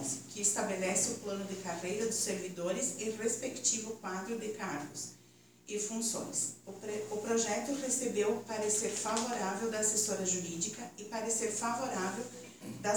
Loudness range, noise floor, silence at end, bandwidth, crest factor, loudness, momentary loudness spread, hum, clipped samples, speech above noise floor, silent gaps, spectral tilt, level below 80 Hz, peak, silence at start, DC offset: 4 LU; -62 dBFS; 0 s; over 20 kHz; 20 dB; -34 LUFS; 10 LU; none; under 0.1%; 26 dB; none; -2.5 dB/octave; -74 dBFS; -16 dBFS; 0 s; under 0.1%